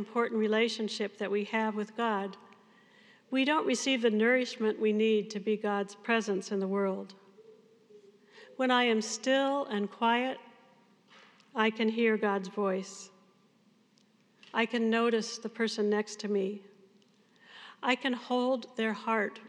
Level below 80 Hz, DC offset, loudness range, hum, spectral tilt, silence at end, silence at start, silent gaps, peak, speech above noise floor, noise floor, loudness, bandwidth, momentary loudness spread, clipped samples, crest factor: under -90 dBFS; under 0.1%; 4 LU; none; -4 dB/octave; 0 s; 0 s; none; -12 dBFS; 36 dB; -67 dBFS; -30 LUFS; 10.5 kHz; 9 LU; under 0.1%; 20 dB